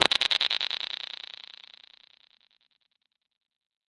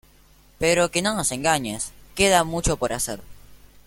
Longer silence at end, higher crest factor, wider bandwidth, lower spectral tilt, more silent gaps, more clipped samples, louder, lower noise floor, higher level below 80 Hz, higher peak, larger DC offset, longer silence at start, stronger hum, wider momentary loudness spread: first, 2.9 s vs 0.3 s; first, 32 dB vs 20 dB; second, 11.5 kHz vs 17 kHz; second, -0.5 dB/octave vs -3 dB/octave; neither; neither; second, -26 LUFS vs -22 LUFS; first, -78 dBFS vs -54 dBFS; second, -72 dBFS vs -42 dBFS; about the same, -2 dBFS vs -4 dBFS; neither; second, 0 s vs 0.6 s; neither; first, 24 LU vs 11 LU